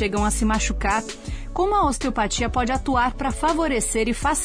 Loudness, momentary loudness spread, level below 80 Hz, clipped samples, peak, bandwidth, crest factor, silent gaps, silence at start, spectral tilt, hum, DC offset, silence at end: -22 LUFS; 4 LU; -30 dBFS; under 0.1%; -10 dBFS; 10.5 kHz; 12 dB; none; 0 s; -4 dB/octave; none; under 0.1%; 0 s